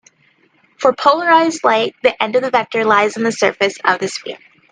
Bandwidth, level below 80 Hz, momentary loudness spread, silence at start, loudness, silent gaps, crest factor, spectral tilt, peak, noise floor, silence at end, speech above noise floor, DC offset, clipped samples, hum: 10 kHz; -62 dBFS; 8 LU; 0.8 s; -15 LUFS; none; 16 dB; -3.5 dB/octave; 0 dBFS; -56 dBFS; 0.35 s; 41 dB; under 0.1%; under 0.1%; none